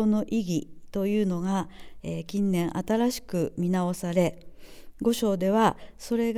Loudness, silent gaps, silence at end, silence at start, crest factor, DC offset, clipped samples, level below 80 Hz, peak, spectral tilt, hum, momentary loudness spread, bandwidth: -27 LUFS; none; 0 s; 0 s; 20 dB; under 0.1%; under 0.1%; -52 dBFS; -6 dBFS; -6.5 dB/octave; none; 10 LU; over 20 kHz